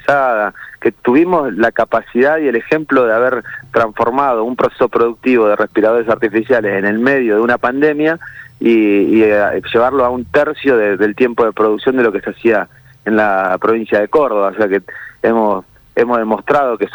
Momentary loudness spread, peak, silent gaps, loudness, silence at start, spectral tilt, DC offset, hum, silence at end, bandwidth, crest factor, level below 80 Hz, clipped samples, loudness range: 6 LU; -2 dBFS; none; -14 LUFS; 0.05 s; -7.5 dB/octave; under 0.1%; none; 0 s; over 20 kHz; 10 dB; -50 dBFS; under 0.1%; 2 LU